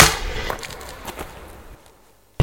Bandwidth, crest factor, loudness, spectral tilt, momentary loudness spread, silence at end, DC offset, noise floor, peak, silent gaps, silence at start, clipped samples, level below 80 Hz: 17 kHz; 22 dB; -24 LUFS; -3 dB/octave; 20 LU; 0 s; under 0.1%; -54 dBFS; 0 dBFS; none; 0 s; under 0.1%; -34 dBFS